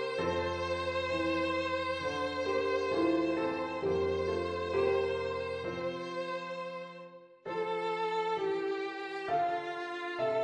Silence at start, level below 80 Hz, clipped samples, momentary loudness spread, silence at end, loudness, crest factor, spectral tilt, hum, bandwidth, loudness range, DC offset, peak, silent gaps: 0 s; -60 dBFS; under 0.1%; 8 LU; 0 s; -33 LUFS; 16 dB; -5.5 dB/octave; none; 10 kHz; 4 LU; under 0.1%; -18 dBFS; none